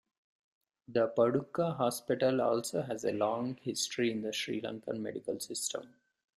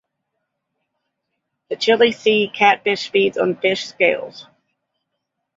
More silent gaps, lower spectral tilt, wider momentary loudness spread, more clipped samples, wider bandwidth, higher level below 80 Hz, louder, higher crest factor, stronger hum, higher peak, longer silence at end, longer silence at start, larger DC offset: neither; about the same, -4.5 dB/octave vs -4 dB/octave; about the same, 9 LU vs 8 LU; neither; first, 15.5 kHz vs 7.8 kHz; second, -74 dBFS vs -68 dBFS; second, -33 LUFS vs -17 LUFS; about the same, 18 dB vs 20 dB; neither; second, -16 dBFS vs -2 dBFS; second, 0.5 s vs 1.15 s; second, 0.9 s vs 1.7 s; neither